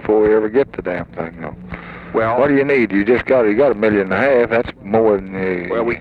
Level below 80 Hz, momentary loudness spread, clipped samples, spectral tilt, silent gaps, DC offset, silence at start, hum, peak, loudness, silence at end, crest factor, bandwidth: -44 dBFS; 14 LU; under 0.1%; -9 dB/octave; none; under 0.1%; 0 s; none; -2 dBFS; -16 LUFS; 0 s; 14 dB; 5 kHz